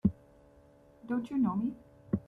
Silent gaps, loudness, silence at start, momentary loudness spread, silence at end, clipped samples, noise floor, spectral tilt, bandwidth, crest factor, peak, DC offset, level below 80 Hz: none; -34 LUFS; 0.05 s; 23 LU; 0.05 s; under 0.1%; -60 dBFS; -10 dB/octave; 5 kHz; 22 dB; -14 dBFS; under 0.1%; -58 dBFS